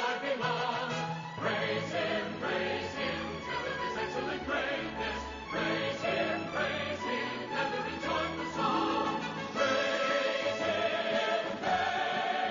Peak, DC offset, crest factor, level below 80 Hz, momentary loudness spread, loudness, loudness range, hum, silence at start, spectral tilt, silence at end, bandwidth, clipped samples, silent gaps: -18 dBFS; under 0.1%; 16 dB; -58 dBFS; 6 LU; -32 LUFS; 3 LU; none; 0 s; -2 dB/octave; 0 s; 7.2 kHz; under 0.1%; none